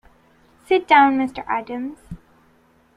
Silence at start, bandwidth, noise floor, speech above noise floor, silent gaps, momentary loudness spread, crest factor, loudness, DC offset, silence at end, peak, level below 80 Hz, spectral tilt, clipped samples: 0.7 s; 11 kHz; -57 dBFS; 38 dB; none; 26 LU; 20 dB; -18 LUFS; under 0.1%; 0.8 s; -2 dBFS; -54 dBFS; -5.5 dB/octave; under 0.1%